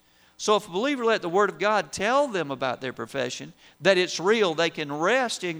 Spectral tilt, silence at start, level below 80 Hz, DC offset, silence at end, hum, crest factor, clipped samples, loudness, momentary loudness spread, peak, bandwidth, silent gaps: -3.5 dB/octave; 0.4 s; -66 dBFS; under 0.1%; 0 s; none; 18 dB; under 0.1%; -25 LUFS; 9 LU; -6 dBFS; over 20 kHz; none